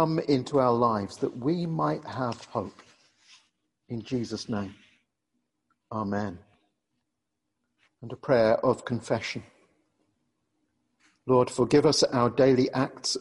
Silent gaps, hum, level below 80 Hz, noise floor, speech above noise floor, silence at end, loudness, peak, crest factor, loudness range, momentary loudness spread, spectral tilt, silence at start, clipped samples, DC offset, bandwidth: none; none; -62 dBFS; -83 dBFS; 57 dB; 0 s; -26 LUFS; -10 dBFS; 20 dB; 13 LU; 17 LU; -5.5 dB/octave; 0 s; under 0.1%; under 0.1%; 11.5 kHz